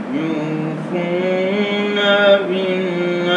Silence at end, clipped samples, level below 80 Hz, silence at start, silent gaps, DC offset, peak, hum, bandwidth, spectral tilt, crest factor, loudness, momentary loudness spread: 0 s; under 0.1%; -76 dBFS; 0 s; none; under 0.1%; -2 dBFS; none; 9.6 kHz; -6.5 dB/octave; 16 dB; -17 LUFS; 9 LU